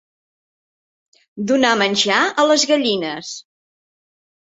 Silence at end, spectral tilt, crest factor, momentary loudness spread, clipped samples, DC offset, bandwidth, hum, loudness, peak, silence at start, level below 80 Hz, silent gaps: 1.2 s; -2.5 dB/octave; 18 dB; 14 LU; under 0.1%; under 0.1%; 8.2 kHz; none; -16 LUFS; -2 dBFS; 1.35 s; -66 dBFS; none